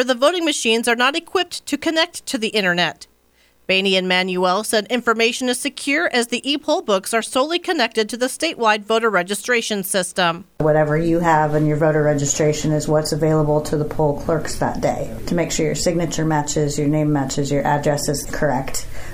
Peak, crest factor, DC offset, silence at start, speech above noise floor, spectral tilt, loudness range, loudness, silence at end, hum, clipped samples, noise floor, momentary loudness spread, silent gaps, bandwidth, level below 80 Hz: -2 dBFS; 16 dB; under 0.1%; 0 s; 38 dB; -4 dB/octave; 2 LU; -19 LUFS; 0 s; none; under 0.1%; -57 dBFS; 5 LU; none; 19.5 kHz; -38 dBFS